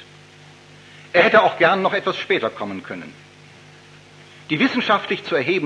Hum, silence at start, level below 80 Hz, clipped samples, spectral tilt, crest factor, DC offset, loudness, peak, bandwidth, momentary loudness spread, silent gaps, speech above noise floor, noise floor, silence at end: 50 Hz at -55 dBFS; 0 s; -70 dBFS; under 0.1%; -5.5 dB/octave; 20 dB; under 0.1%; -18 LUFS; -2 dBFS; 10.5 kHz; 17 LU; none; 27 dB; -46 dBFS; 0 s